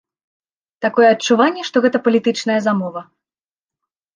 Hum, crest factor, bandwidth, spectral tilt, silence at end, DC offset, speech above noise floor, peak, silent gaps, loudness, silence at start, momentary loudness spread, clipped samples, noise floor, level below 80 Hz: none; 16 dB; 9.8 kHz; -4.5 dB/octave; 1.15 s; under 0.1%; over 74 dB; -2 dBFS; none; -16 LUFS; 0.8 s; 9 LU; under 0.1%; under -90 dBFS; -70 dBFS